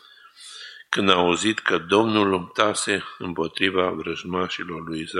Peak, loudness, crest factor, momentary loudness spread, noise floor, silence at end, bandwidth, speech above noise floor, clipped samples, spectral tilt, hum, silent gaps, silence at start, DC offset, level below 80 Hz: -2 dBFS; -22 LUFS; 22 dB; 13 LU; -47 dBFS; 0 s; 12 kHz; 24 dB; under 0.1%; -3.5 dB/octave; none; none; 0.4 s; under 0.1%; -60 dBFS